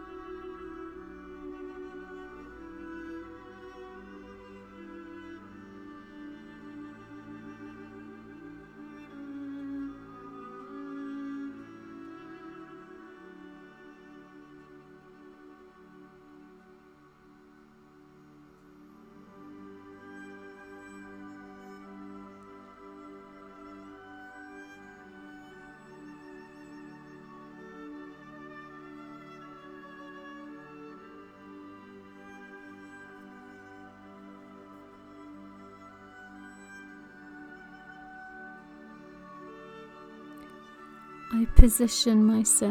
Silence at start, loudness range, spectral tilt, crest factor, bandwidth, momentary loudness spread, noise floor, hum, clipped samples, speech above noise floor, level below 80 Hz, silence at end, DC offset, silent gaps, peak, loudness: 0 s; 10 LU; -4.5 dB/octave; 32 dB; 17 kHz; 12 LU; -57 dBFS; none; under 0.1%; 39 dB; -36 dBFS; 0 s; under 0.1%; none; 0 dBFS; -33 LUFS